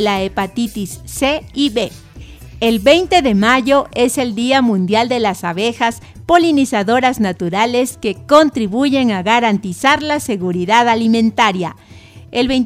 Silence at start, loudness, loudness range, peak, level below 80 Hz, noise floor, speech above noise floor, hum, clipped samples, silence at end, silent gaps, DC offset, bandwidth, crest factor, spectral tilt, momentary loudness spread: 0 s; -14 LUFS; 2 LU; 0 dBFS; -42 dBFS; -35 dBFS; 21 dB; none; 0.1%; 0 s; none; under 0.1%; 16 kHz; 14 dB; -4.5 dB/octave; 9 LU